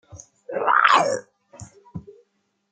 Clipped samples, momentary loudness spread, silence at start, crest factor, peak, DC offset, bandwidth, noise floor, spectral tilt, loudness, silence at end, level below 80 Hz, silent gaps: under 0.1%; 25 LU; 0.15 s; 24 dB; 0 dBFS; under 0.1%; 9.6 kHz; -69 dBFS; -2.5 dB/octave; -19 LUFS; 0.7 s; -62 dBFS; none